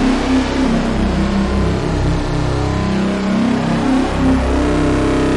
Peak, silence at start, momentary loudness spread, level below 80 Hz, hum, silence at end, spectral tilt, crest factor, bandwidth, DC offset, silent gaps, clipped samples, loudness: -6 dBFS; 0 s; 3 LU; -22 dBFS; none; 0 s; -6.5 dB/octave; 10 dB; 11.5 kHz; under 0.1%; none; under 0.1%; -16 LUFS